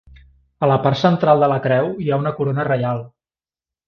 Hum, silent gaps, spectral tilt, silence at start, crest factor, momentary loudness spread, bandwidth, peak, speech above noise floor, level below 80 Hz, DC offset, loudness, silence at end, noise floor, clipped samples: none; none; -8 dB/octave; 0.1 s; 18 dB; 7 LU; 6.8 kHz; -2 dBFS; over 73 dB; -52 dBFS; under 0.1%; -18 LUFS; 0.8 s; under -90 dBFS; under 0.1%